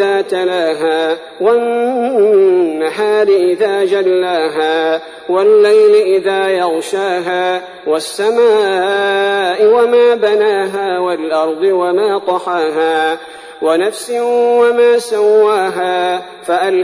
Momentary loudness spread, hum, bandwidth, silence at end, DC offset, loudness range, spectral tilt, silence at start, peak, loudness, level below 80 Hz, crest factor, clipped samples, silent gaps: 8 LU; none; 11 kHz; 0 s; under 0.1%; 2 LU; -4 dB/octave; 0 s; -2 dBFS; -13 LUFS; -62 dBFS; 10 dB; under 0.1%; none